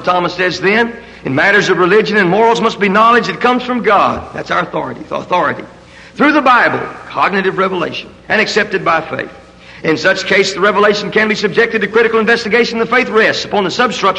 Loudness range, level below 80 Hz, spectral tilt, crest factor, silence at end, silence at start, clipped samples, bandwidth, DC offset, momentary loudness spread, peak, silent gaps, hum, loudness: 4 LU; -48 dBFS; -4.5 dB/octave; 12 dB; 0 s; 0 s; under 0.1%; 10.5 kHz; under 0.1%; 11 LU; 0 dBFS; none; none; -12 LUFS